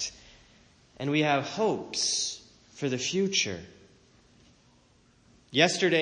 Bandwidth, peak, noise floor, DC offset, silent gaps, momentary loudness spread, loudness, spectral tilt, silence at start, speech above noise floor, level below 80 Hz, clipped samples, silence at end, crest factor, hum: 10 kHz; -8 dBFS; -62 dBFS; under 0.1%; none; 12 LU; -27 LUFS; -3 dB/octave; 0 s; 35 dB; -66 dBFS; under 0.1%; 0 s; 22 dB; none